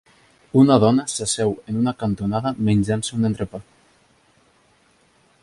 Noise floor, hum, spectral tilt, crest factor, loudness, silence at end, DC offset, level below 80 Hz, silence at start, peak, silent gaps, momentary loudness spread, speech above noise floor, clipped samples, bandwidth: -59 dBFS; none; -6 dB/octave; 20 dB; -20 LUFS; 1.8 s; under 0.1%; -50 dBFS; 0.55 s; -2 dBFS; none; 9 LU; 40 dB; under 0.1%; 11.5 kHz